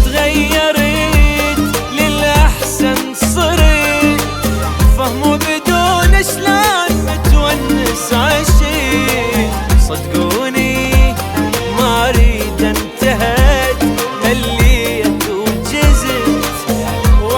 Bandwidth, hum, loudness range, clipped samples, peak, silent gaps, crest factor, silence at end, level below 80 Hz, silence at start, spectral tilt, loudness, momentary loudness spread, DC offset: 19 kHz; none; 1 LU; under 0.1%; 0 dBFS; none; 12 dB; 0 s; -16 dBFS; 0 s; -4.5 dB/octave; -13 LUFS; 5 LU; under 0.1%